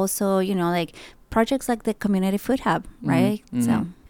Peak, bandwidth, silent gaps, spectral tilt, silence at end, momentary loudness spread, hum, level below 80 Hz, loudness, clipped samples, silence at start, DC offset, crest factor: -8 dBFS; 19 kHz; none; -5.5 dB/octave; 0.15 s; 5 LU; none; -48 dBFS; -23 LUFS; under 0.1%; 0 s; under 0.1%; 16 dB